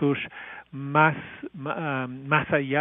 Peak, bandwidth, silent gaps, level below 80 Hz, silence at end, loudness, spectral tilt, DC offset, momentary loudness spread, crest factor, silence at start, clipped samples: -6 dBFS; 3.8 kHz; none; -64 dBFS; 0 s; -25 LUFS; -5 dB/octave; under 0.1%; 17 LU; 20 dB; 0 s; under 0.1%